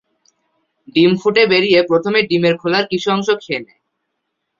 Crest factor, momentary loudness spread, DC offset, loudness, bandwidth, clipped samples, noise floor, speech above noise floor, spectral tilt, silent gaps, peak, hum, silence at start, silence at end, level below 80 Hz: 16 dB; 8 LU; under 0.1%; -15 LUFS; 7.4 kHz; under 0.1%; -74 dBFS; 59 dB; -5.5 dB/octave; none; 0 dBFS; none; 0.95 s; 0.95 s; -60 dBFS